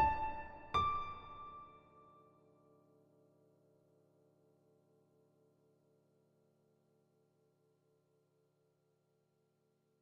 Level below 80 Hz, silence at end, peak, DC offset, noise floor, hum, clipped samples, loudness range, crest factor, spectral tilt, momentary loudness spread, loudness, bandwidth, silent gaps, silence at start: -62 dBFS; 8 s; -22 dBFS; under 0.1%; -80 dBFS; none; under 0.1%; 19 LU; 24 dB; -3 dB/octave; 19 LU; -40 LUFS; 7.6 kHz; none; 0 s